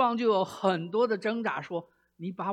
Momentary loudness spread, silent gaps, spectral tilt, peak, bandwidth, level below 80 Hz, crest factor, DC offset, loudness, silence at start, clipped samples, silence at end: 12 LU; none; -6.5 dB/octave; -12 dBFS; 13 kHz; -78 dBFS; 18 dB; under 0.1%; -29 LUFS; 0 s; under 0.1%; 0 s